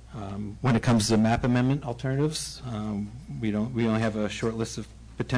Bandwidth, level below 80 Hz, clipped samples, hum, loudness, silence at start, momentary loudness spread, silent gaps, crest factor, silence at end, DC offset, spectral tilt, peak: 11 kHz; -46 dBFS; under 0.1%; none; -27 LUFS; 0 s; 13 LU; none; 12 dB; 0 s; under 0.1%; -6 dB/octave; -16 dBFS